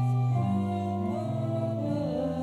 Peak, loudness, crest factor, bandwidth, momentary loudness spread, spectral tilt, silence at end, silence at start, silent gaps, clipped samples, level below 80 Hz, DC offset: -18 dBFS; -29 LUFS; 10 dB; 8.6 kHz; 4 LU; -9.5 dB/octave; 0 s; 0 s; none; under 0.1%; -58 dBFS; under 0.1%